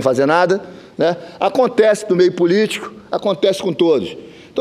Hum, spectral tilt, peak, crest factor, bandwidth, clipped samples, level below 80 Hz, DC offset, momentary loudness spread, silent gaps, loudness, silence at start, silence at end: none; -5.5 dB/octave; 0 dBFS; 16 dB; 13.5 kHz; under 0.1%; -62 dBFS; under 0.1%; 12 LU; none; -16 LUFS; 0 s; 0 s